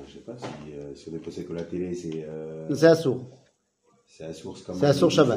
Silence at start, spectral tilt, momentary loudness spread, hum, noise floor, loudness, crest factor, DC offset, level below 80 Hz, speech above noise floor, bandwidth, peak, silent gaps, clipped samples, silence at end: 0 s; -6 dB/octave; 20 LU; none; -67 dBFS; -25 LUFS; 22 dB; under 0.1%; -62 dBFS; 41 dB; 15.5 kHz; -4 dBFS; none; under 0.1%; 0 s